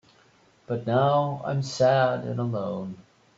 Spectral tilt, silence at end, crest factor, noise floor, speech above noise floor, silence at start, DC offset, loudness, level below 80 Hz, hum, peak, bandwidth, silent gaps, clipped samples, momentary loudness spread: -6.5 dB/octave; 0.35 s; 16 dB; -60 dBFS; 35 dB; 0.7 s; under 0.1%; -25 LUFS; -66 dBFS; none; -10 dBFS; 8 kHz; none; under 0.1%; 13 LU